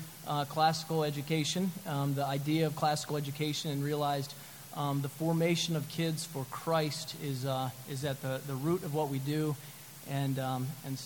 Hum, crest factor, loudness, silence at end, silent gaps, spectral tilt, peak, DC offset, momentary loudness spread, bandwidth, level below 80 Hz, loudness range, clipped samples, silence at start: none; 18 dB; -34 LUFS; 0 s; none; -5 dB/octave; -14 dBFS; under 0.1%; 8 LU; 17.5 kHz; -70 dBFS; 3 LU; under 0.1%; 0 s